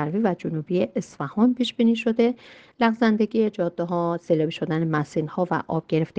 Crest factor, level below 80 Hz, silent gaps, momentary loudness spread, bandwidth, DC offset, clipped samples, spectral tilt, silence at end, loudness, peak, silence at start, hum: 18 dB; -64 dBFS; none; 6 LU; 8.4 kHz; under 0.1%; under 0.1%; -7.5 dB/octave; 0.1 s; -24 LUFS; -6 dBFS; 0 s; none